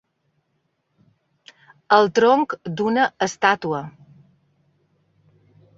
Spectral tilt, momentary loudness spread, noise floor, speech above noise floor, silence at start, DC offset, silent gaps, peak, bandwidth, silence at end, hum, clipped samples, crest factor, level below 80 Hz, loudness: -4.5 dB/octave; 11 LU; -71 dBFS; 53 dB; 1.9 s; under 0.1%; none; -2 dBFS; 7.8 kHz; 1.9 s; none; under 0.1%; 22 dB; -66 dBFS; -19 LUFS